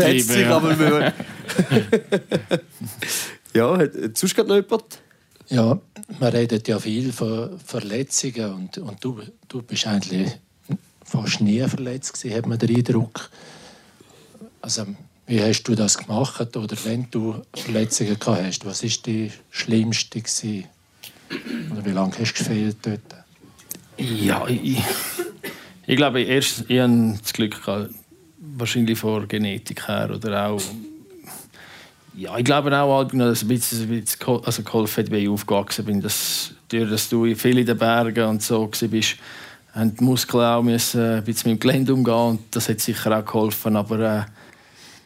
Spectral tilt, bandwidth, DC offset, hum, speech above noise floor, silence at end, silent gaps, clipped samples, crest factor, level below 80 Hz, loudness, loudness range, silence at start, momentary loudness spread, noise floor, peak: -4.5 dB/octave; 16 kHz; under 0.1%; none; 29 dB; 0.1 s; none; under 0.1%; 18 dB; -64 dBFS; -22 LUFS; 5 LU; 0 s; 14 LU; -50 dBFS; -4 dBFS